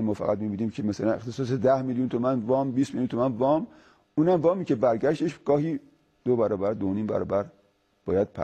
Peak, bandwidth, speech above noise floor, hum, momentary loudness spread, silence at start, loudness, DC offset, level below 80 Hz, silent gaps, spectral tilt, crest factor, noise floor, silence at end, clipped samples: -10 dBFS; 9 kHz; 40 dB; none; 6 LU; 0 s; -26 LUFS; under 0.1%; -60 dBFS; none; -8 dB/octave; 16 dB; -66 dBFS; 0 s; under 0.1%